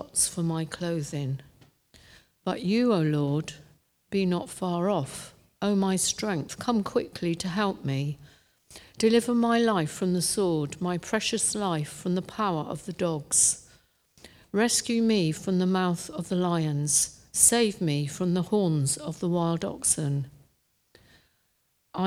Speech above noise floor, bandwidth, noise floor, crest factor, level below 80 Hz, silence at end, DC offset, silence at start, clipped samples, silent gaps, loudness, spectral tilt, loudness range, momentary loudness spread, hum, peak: 45 dB; 16 kHz; -71 dBFS; 22 dB; -60 dBFS; 0 s; under 0.1%; 0 s; under 0.1%; none; -26 LUFS; -4 dB/octave; 5 LU; 9 LU; none; -6 dBFS